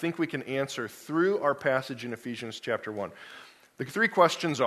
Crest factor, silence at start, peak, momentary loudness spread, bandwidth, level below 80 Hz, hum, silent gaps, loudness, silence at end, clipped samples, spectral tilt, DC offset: 22 dB; 0 s; -6 dBFS; 15 LU; 13.5 kHz; -74 dBFS; none; none; -29 LUFS; 0 s; under 0.1%; -5 dB/octave; under 0.1%